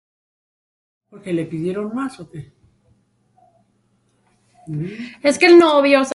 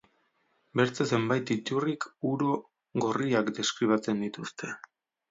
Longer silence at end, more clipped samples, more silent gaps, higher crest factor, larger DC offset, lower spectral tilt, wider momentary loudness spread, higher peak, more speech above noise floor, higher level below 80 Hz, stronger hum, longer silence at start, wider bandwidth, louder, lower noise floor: second, 0 s vs 0.55 s; neither; neither; about the same, 18 dB vs 20 dB; neither; about the same, -5 dB/octave vs -5 dB/octave; first, 26 LU vs 10 LU; first, 0 dBFS vs -10 dBFS; first, 47 dB vs 43 dB; first, -62 dBFS vs -74 dBFS; neither; first, 1.25 s vs 0.75 s; first, 11.5 kHz vs 7.8 kHz; first, -16 LUFS vs -30 LUFS; second, -63 dBFS vs -72 dBFS